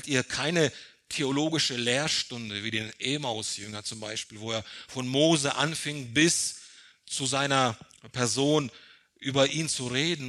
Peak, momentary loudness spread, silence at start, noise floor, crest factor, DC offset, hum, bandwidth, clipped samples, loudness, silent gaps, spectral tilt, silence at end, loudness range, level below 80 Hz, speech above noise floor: -8 dBFS; 12 LU; 0 s; -52 dBFS; 22 dB; under 0.1%; none; 13 kHz; under 0.1%; -27 LUFS; none; -3 dB/octave; 0 s; 3 LU; -66 dBFS; 24 dB